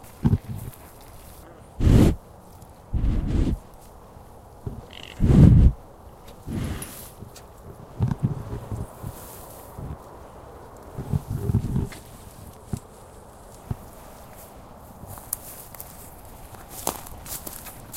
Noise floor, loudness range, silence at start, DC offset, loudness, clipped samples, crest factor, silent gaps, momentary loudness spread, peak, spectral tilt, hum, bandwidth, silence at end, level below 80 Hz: -46 dBFS; 16 LU; 0.25 s; under 0.1%; -24 LUFS; under 0.1%; 24 dB; none; 26 LU; -2 dBFS; -7 dB/octave; none; 16.5 kHz; 0 s; -30 dBFS